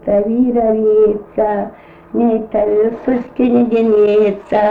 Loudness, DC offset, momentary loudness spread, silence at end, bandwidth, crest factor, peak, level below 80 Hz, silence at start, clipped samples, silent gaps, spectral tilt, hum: -14 LUFS; under 0.1%; 7 LU; 0 s; 4.6 kHz; 10 dB; -2 dBFS; -44 dBFS; 0.05 s; under 0.1%; none; -9 dB/octave; none